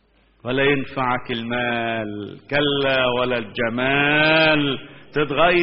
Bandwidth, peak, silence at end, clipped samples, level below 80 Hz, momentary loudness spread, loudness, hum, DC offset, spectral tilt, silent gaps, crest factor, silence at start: 5.8 kHz; -4 dBFS; 0 s; under 0.1%; -48 dBFS; 12 LU; -20 LUFS; none; under 0.1%; -2.5 dB/octave; none; 18 dB; 0.45 s